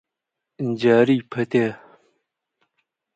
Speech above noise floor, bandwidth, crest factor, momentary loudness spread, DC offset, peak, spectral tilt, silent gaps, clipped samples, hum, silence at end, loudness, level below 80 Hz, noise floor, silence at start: 64 dB; 8.8 kHz; 20 dB; 11 LU; under 0.1%; -4 dBFS; -7.5 dB/octave; none; under 0.1%; none; 1.4 s; -20 LUFS; -66 dBFS; -83 dBFS; 0.6 s